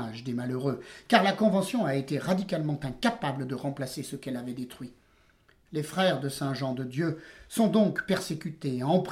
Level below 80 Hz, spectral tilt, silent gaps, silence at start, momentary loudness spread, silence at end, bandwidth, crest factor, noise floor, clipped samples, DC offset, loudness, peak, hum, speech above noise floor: -62 dBFS; -6 dB/octave; none; 0 s; 13 LU; 0 s; 16.5 kHz; 24 dB; -63 dBFS; under 0.1%; under 0.1%; -29 LUFS; -6 dBFS; none; 34 dB